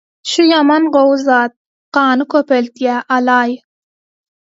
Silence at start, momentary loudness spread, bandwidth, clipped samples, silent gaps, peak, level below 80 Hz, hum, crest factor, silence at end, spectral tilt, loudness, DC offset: 0.25 s; 8 LU; 8 kHz; under 0.1%; 1.56-1.92 s; 0 dBFS; -66 dBFS; none; 14 dB; 1.05 s; -3 dB/octave; -13 LUFS; under 0.1%